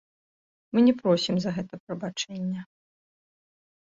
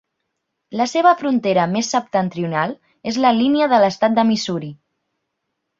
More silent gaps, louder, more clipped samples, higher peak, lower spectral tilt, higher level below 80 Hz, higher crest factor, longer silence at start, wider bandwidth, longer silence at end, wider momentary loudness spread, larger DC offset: first, 1.80-1.87 s vs none; second, -26 LUFS vs -18 LUFS; neither; second, -10 dBFS vs -2 dBFS; about the same, -6 dB/octave vs -5 dB/octave; about the same, -66 dBFS vs -62 dBFS; about the same, 18 dB vs 16 dB; about the same, 0.75 s vs 0.7 s; about the same, 7.8 kHz vs 7.6 kHz; about the same, 1.15 s vs 1.05 s; first, 14 LU vs 10 LU; neither